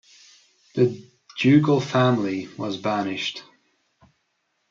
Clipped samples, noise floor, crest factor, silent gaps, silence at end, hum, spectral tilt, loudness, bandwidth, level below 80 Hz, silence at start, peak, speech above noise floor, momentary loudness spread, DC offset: under 0.1%; -73 dBFS; 18 dB; none; 1.3 s; none; -6.5 dB/octave; -22 LUFS; 7.6 kHz; -68 dBFS; 0.75 s; -6 dBFS; 52 dB; 16 LU; under 0.1%